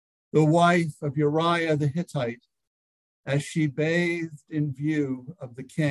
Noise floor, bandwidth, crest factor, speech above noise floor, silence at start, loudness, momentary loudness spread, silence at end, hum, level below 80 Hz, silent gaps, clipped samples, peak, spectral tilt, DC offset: under -90 dBFS; 12 kHz; 18 dB; over 65 dB; 0.35 s; -25 LUFS; 15 LU; 0 s; none; -66 dBFS; 2.67-3.24 s; under 0.1%; -6 dBFS; -6.5 dB/octave; under 0.1%